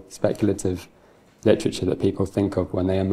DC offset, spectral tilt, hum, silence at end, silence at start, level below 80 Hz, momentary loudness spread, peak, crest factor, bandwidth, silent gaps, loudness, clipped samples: under 0.1%; -6.5 dB/octave; none; 0 s; 0.1 s; -52 dBFS; 6 LU; -4 dBFS; 20 dB; 14.5 kHz; none; -24 LUFS; under 0.1%